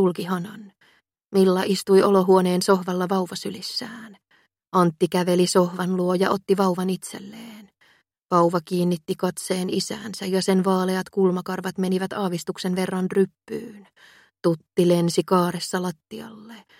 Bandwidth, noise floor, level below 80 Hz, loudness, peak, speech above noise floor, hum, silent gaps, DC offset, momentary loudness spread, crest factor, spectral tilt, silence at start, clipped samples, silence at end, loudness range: 16.5 kHz; -62 dBFS; -68 dBFS; -22 LUFS; -4 dBFS; 40 dB; none; none; under 0.1%; 16 LU; 20 dB; -6 dB/octave; 0 s; under 0.1%; 0.2 s; 5 LU